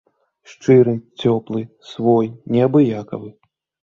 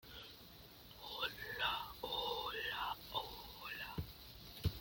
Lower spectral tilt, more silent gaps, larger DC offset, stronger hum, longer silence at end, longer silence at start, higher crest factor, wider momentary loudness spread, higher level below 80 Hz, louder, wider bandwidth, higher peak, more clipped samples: first, -8.5 dB/octave vs -4 dB/octave; neither; neither; neither; first, 0.65 s vs 0 s; first, 0.5 s vs 0.05 s; about the same, 16 dB vs 20 dB; about the same, 15 LU vs 15 LU; about the same, -58 dBFS vs -60 dBFS; first, -17 LUFS vs -43 LUFS; second, 7.2 kHz vs 17 kHz; first, -2 dBFS vs -24 dBFS; neither